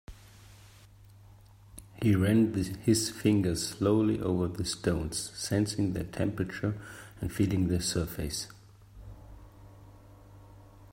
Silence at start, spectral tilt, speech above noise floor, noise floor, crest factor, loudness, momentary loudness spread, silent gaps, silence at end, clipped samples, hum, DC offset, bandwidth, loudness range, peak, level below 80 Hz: 0.1 s; -5.5 dB/octave; 26 dB; -55 dBFS; 20 dB; -30 LUFS; 19 LU; none; 0.1 s; under 0.1%; none; under 0.1%; 16 kHz; 6 LU; -12 dBFS; -52 dBFS